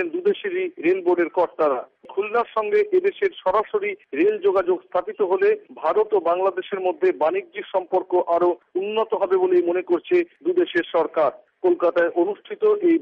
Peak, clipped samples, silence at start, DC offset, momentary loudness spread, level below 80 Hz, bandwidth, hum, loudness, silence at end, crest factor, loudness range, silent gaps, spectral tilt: -10 dBFS; under 0.1%; 0 s; under 0.1%; 6 LU; -68 dBFS; 4.9 kHz; none; -22 LUFS; 0 s; 12 dB; 1 LU; none; -7 dB/octave